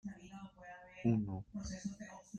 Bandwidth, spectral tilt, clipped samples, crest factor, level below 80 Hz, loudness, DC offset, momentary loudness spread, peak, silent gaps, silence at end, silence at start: 9 kHz; -7 dB/octave; under 0.1%; 20 dB; -62 dBFS; -40 LUFS; under 0.1%; 18 LU; -22 dBFS; none; 0 s; 0.05 s